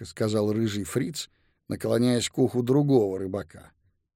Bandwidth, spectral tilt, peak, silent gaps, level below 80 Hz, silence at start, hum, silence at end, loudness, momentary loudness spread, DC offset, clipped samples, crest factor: 16.5 kHz; -6 dB/octave; -8 dBFS; none; -60 dBFS; 0 s; none; 0.55 s; -26 LUFS; 13 LU; under 0.1%; under 0.1%; 18 dB